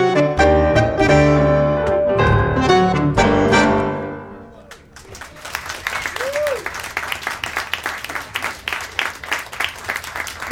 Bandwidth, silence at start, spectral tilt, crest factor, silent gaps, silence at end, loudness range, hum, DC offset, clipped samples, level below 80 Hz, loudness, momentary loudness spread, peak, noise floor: 17.5 kHz; 0 s; -5.5 dB/octave; 18 dB; none; 0 s; 10 LU; none; under 0.1%; under 0.1%; -32 dBFS; -18 LUFS; 13 LU; 0 dBFS; -41 dBFS